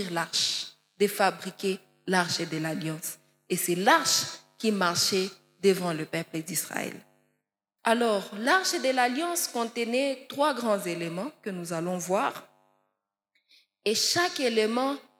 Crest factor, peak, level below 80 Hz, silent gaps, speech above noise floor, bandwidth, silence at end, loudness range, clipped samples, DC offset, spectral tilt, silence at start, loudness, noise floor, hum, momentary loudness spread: 22 dB; -8 dBFS; -86 dBFS; none; 55 dB; 17.5 kHz; 0.2 s; 4 LU; under 0.1%; under 0.1%; -3 dB/octave; 0 s; -27 LUFS; -82 dBFS; none; 11 LU